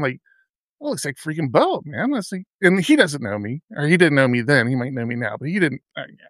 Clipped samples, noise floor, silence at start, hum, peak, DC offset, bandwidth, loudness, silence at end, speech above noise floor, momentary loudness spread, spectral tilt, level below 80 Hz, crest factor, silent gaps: under 0.1%; -63 dBFS; 0 s; none; -2 dBFS; under 0.1%; 14.5 kHz; -20 LUFS; 0.25 s; 43 dB; 14 LU; -5.5 dB/octave; -68 dBFS; 20 dB; 0.50-0.78 s, 2.50-2.59 s, 3.64-3.68 s